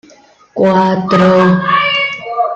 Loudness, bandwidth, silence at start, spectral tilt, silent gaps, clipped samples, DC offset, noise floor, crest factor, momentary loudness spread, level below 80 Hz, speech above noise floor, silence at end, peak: -11 LUFS; 7.4 kHz; 0.55 s; -7 dB/octave; none; under 0.1%; under 0.1%; -44 dBFS; 10 dB; 8 LU; -52 dBFS; 35 dB; 0 s; -2 dBFS